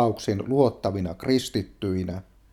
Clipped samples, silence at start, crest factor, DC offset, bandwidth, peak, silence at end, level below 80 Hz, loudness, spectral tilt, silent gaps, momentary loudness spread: under 0.1%; 0 s; 20 dB; under 0.1%; 15.5 kHz; -6 dBFS; 0.3 s; -52 dBFS; -26 LUFS; -6.5 dB/octave; none; 8 LU